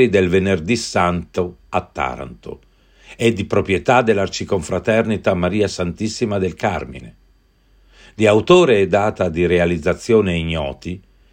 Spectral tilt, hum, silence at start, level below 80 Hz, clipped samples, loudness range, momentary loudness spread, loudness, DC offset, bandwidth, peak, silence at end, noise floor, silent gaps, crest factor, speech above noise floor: -6 dB/octave; none; 0 s; -44 dBFS; under 0.1%; 5 LU; 13 LU; -18 LUFS; under 0.1%; 16 kHz; 0 dBFS; 0.35 s; -55 dBFS; none; 18 dB; 37 dB